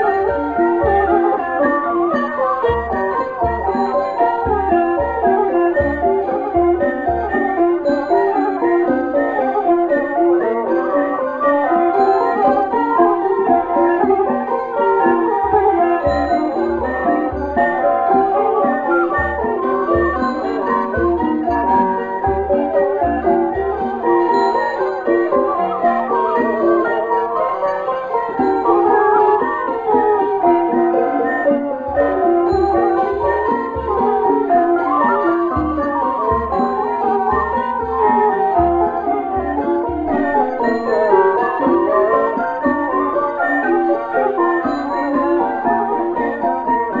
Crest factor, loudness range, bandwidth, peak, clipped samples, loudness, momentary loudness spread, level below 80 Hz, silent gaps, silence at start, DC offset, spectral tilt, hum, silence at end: 16 dB; 2 LU; 7.4 kHz; 0 dBFS; under 0.1%; -16 LUFS; 5 LU; -38 dBFS; none; 0 s; under 0.1%; -8.5 dB/octave; none; 0 s